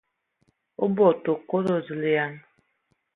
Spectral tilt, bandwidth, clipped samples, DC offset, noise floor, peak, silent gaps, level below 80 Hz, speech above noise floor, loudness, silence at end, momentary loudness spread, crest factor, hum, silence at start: -8.5 dB/octave; 5.8 kHz; under 0.1%; under 0.1%; -72 dBFS; -6 dBFS; none; -72 dBFS; 49 dB; -24 LUFS; 0.75 s; 9 LU; 20 dB; none; 0.8 s